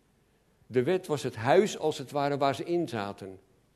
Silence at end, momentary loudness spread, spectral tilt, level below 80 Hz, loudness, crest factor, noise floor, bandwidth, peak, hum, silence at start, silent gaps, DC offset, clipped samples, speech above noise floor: 0.4 s; 12 LU; -5.5 dB/octave; -70 dBFS; -29 LUFS; 22 dB; -67 dBFS; 13.5 kHz; -8 dBFS; none; 0.7 s; none; under 0.1%; under 0.1%; 38 dB